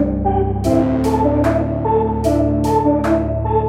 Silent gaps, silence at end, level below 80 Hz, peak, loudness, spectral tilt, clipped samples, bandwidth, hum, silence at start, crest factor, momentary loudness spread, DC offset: none; 0 s; -28 dBFS; -2 dBFS; -17 LUFS; -8.5 dB/octave; under 0.1%; 15.5 kHz; none; 0 s; 14 dB; 2 LU; under 0.1%